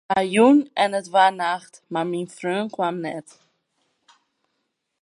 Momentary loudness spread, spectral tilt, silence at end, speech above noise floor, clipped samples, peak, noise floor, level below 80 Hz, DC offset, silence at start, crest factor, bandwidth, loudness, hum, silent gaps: 14 LU; -5 dB/octave; 1.8 s; 55 dB; under 0.1%; -4 dBFS; -76 dBFS; -70 dBFS; under 0.1%; 0.1 s; 18 dB; 11.5 kHz; -21 LUFS; none; none